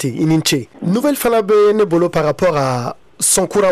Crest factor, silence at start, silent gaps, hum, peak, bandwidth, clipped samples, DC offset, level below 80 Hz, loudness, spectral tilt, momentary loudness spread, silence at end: 8 dB; 0 s; none; none; -6 dBFS; 16 kHz; under 0.1%; under 0.1%; -46 dBFS; -15 LUFS; -4.5 dB/octave; 7 LU; 0 s